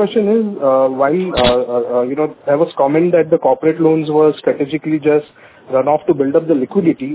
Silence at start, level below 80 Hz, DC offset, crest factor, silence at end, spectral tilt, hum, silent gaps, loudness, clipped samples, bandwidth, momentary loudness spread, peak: 0 s; -44 dBFS; under 0.1%; 14 dB; 0 s; -11 dB/octave; none; none; -14 LUFS; under 0.1%; 4 kHz; 5 LU; 0 dBFS